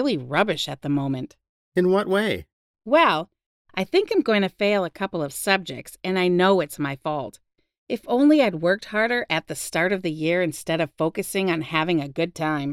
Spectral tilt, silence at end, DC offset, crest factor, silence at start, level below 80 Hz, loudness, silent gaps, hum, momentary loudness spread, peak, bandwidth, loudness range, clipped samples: -5 dB/octave; 0 s; under 0.1%; 18 dB; 0 s; -62 dBFS; -23 LUFS; 1.49-1.72 s, 2.53-2.74 s, 3.46-3.65 s, 7.78-7.87 s; none; 12 LU; -4 dBFS; 16 kHz; 2 LU; under 0.1%